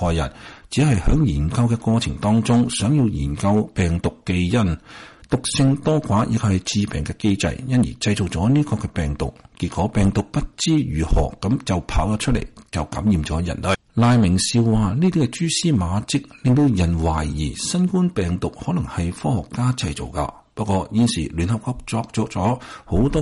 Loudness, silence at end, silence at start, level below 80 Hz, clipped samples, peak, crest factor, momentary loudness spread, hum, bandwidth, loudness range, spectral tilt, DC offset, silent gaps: -21 LUFS; 0 s; 0 s; -32 dBFS; under 0.1%; -8 dBFS; 12 dB; 8 LU; none; 11.5 kHz; 4 LU; -6 dB/octave; under 0.1%; none